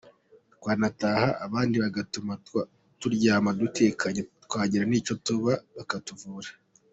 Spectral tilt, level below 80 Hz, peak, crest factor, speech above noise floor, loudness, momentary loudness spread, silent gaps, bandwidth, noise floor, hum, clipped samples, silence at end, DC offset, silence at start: -5.5 dB/octave; -62 dBFS; -10 dBFS; 18 dB; 33 dB; -27 LUFS; 13 LU; none; 8 kHz; -60 dBFS; none; under 0.1%; 0.4 s; under 0.1%; 0.6 s